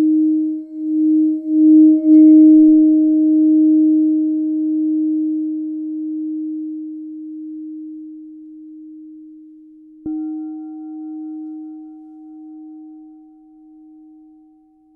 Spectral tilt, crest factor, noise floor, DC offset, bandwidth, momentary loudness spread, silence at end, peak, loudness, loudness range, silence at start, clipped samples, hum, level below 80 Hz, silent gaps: -12 dB/octave; 14 dB; -51 dBFS; under 0.1%; 0.8 kHz; 23 LU; 1.95 s; -2 dBFS; -14 LUFS; 22 LU; 0 s; under 0.1%; none; -66 dBFS; none